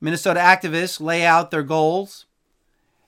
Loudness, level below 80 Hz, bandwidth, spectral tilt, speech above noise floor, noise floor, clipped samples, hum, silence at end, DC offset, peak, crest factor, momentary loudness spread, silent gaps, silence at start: -18 LUFS; -68 dBFS; 17 kHz; -4.5 dB/octave; 49 dB; -67 dBFS; under 0.1%; none; 0.9 s; under 0.1%; 0 dBFS; 20 dB; 8 LU; none; 0 s